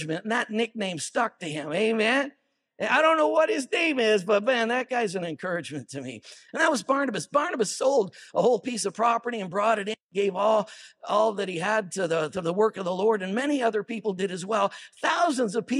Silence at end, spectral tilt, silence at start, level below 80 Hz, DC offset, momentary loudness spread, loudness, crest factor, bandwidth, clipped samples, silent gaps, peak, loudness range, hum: 0 s; -4 dB/octave; 0 s; -80 dBFS; under 0.1%; 9 LU; -25 LUFS; 18 dB; 13.5 kHz; under 0.1%; 10.01-10.09 s; -8 dBFS; 3 LU; none